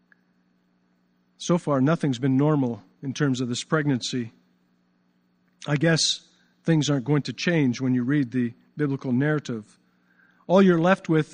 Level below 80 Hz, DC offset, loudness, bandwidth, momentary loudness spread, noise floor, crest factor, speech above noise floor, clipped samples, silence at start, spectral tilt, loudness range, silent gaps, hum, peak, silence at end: -68 dBFS; under 0.1%; -24 LUFS; 10 kHz; 12 LU; -66 dBFS; 20 dB; 44 dB; under 0.1%; 1.4 s; -5.5 dB/octave; 3 LU; none; 60 Hz at -55 dBFS; -4 dBFS; 0.1 s